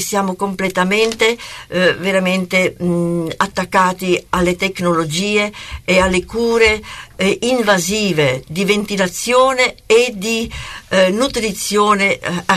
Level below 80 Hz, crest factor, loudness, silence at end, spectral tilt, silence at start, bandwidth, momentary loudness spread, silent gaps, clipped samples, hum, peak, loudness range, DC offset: -40 dBFS; 14 dB; -15 LUFS; 0 s; -4 dB/octave; 0 s; 13.5 kHz; 6 LU; none; under 0.1%; none; -2 dBFS; 2 LU; under 0.1%